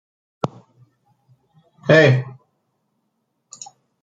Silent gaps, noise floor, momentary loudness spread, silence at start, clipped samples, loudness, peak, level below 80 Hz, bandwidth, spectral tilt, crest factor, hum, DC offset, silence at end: none; -72 dBFS; 26 LU; 0.45 s; under 0.1%; -17 LUFS; 0 dBFS; -62 dBFS; 7.8 kHz; -6 dB/octave; 22 dB; none; under 0.1%; 1.75 s